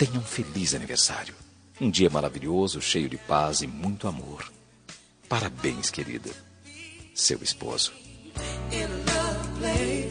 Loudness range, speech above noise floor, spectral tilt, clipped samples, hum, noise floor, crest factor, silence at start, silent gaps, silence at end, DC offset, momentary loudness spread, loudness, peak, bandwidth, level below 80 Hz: 6 LU; 23 dB; -3.5 dB/octave; under 0.1%; none; -50 dBFS; 22 dB; 0 s; none; 0 s; under 0.1%; 19 LU; -27 LUFS; -8 dBFS; 10 kHz; -44 dBFS